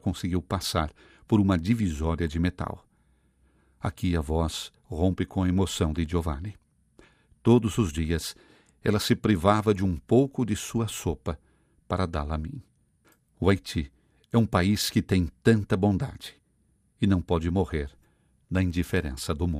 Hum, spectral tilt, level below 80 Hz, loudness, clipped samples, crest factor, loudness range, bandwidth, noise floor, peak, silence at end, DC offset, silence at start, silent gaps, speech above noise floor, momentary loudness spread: none; -6 dB/octave; -44 dBFS; -27 LUFS; under 0.1%; 22 dB; 5 LU; 15.5 kHz; -67 dBFS; -6 dBFS; 0 s; under 0.1%; 0.05 s; none; 42 dB; 12 LU